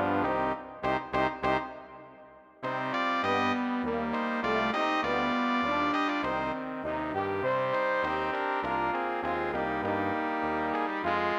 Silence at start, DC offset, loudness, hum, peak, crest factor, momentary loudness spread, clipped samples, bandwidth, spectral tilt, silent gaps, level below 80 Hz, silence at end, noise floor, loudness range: 0 s; under 0.1%; -30 LUFS; none; -14 dBFS; 16 dB; 6 LU; under 0.1%; 10.5 kHz; -6 dB/octave; none; -56 dBFS; 0 s; -53 dBFS; 3 LU